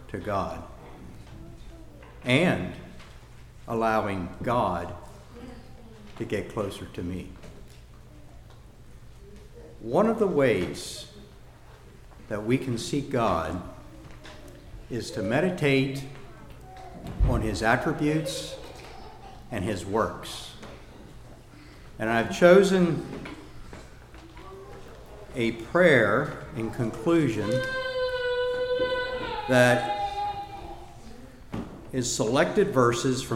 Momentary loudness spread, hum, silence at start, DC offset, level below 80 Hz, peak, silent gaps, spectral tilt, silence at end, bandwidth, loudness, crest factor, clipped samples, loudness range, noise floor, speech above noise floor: 24 LU; none; 0 s; under 0.1%; -44 dBFS; -4 dBFS; none; -5.5 dB/octave; 0 s; 16 kHz; -26 LUFS; 24 dB; under 0.1%; 9 LU; -49 dBFS; 24 dB